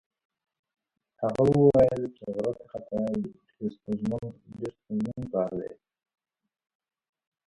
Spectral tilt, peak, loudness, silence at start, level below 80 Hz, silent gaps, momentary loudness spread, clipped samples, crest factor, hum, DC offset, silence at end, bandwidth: -9.5 dB/octave; -8 dBFS; -28 LUFS; 1.2 s; -56 dBFS; none; 18 LU; under 0.1%; 22 dB; none; under 0.1%; 1.75 s; 11 kHz